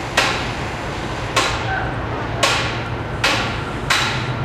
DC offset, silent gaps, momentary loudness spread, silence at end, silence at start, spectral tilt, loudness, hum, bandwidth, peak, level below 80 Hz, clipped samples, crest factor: under 0.1%; none; 8 LU; 0 s; 0 s; -3.5 dB/octave; -20 LUFS; none; 15.5 kHz; 0 dBFS; -34 dBFS; under 0.1%; 20 dB